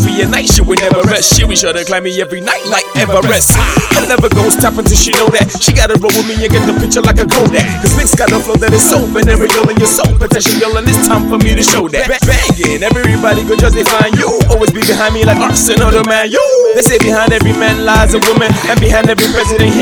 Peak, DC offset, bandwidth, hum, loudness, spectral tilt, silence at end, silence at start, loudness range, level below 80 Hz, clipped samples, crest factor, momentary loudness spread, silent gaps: 0 dBFS; under 0.1%; over 20 kHz; none; -9 LUFS; -4 dB/octave; 0 s; 0 s; 1 LU; -18 dBFS; 0.5%; 8 dB; 3 LU; none